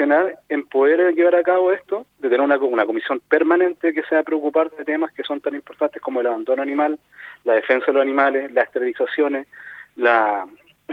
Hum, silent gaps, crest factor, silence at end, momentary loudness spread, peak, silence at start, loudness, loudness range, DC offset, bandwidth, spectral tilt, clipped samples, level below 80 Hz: none; none; 18 dB; 0 s; 11 LU; -2 dBFS; 0 s; -19 LUFS; 4 LU; under 0.1%; 4.9 kHz; -6 dB/octave; under 0.1%; -72 dBFS